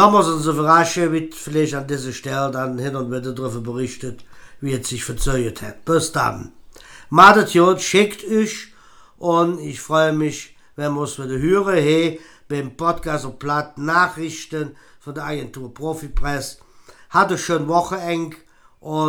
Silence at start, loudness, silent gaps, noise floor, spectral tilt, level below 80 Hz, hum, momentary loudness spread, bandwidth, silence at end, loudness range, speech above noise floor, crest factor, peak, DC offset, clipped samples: 0 s; -19 LUFS; none; -47 dBFS; -5 dB/octave; -38 dBFS; none; 15 LU; 19.5 kHz; 0 s; 9 LU; 28 dB; 20 dB; 0 dBFS; under 0.1%; under 0.1%